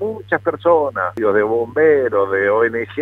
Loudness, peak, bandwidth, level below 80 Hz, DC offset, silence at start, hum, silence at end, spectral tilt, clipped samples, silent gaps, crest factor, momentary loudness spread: -16 LUFS; -2 dBFS; 4 kHz; -56 dBFS; under 0.1%; 0 s; none; 0 s; -8 dB/octave; under 0.1%; none; 14 dB; 6 LU